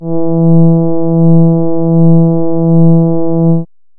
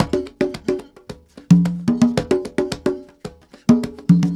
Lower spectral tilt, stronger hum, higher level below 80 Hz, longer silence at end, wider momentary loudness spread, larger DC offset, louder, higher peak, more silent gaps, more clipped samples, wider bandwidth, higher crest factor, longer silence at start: first, -19 dB/octave vs -7.5 dB/octave; neither; about the same, -46 dBFS vs -46 dBFS; first, 0.35 s vs 0 s; second, 5 LU vs 22 LU; neither; first, -9 LUFS vs -19 LUFS; about the same, 0 dBFS vs 0 dBFS; neither; neither; second, 1.4 kHz vs 11.5 kHz; second, 6 dB vs 18 dB; about the same, 0 s vs 0 s